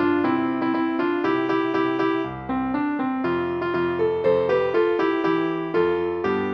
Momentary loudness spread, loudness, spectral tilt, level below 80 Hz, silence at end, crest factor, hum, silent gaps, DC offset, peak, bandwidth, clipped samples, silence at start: 4 LU; -23 LUFS; -8 dB/octave; -56 dBFS; 0 s; 14 dB; none; none; under 0.1%; -8 dBFS; 6 kHz; under 0.1%; 0 s